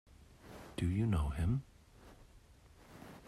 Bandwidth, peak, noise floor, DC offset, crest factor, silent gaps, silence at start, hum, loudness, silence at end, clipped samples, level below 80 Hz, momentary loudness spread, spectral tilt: 13 kHz; -24 dBFS; -61 dBFS; under 0.1%; 16 dB; none; 0.2 s; none; -37 LUFS; 0.1 s; under 0.1%; -48 dBFS; 25 LU; -7.5 dB/octave